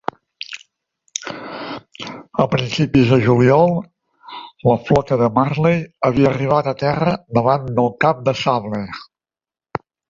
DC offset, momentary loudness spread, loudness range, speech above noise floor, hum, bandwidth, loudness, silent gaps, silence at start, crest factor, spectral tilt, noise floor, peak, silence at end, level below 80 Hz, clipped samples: under 0.1%; 18 LU; 3 LU; over 74 dB; none; 7.6 kHz; -17 LUFS; none; 0.5 s; 16 dB; -6.5 dB/octave; under -90 dBFS; -2 dBFS; 0.35 s; -46 dBFS; under 0.1%